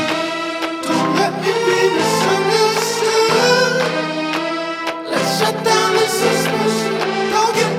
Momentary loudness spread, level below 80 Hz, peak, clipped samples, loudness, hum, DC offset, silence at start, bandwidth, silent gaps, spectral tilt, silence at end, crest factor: 7 LU; -60 dBFS; -2 dBFS; under 0.1%; -16 LUFS; none; under 0.1%; 0 s; 16.5 kHz; none; -3.5 dB/octave; 0 s; 14 dB